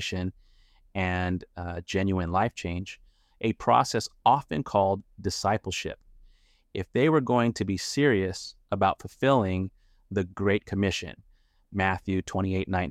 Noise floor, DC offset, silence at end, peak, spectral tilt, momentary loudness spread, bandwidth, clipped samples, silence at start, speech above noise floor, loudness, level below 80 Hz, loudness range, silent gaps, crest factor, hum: -59 dBFS; under 0.1%; 0 s; -8 dBFS; -5.5 dB/octave; 13 LU; 14.5 kHz; under 0.1%; 0 s; 32 dB; -27 LUFS; -52 dBFS; 4 LU; none; 20 dB; none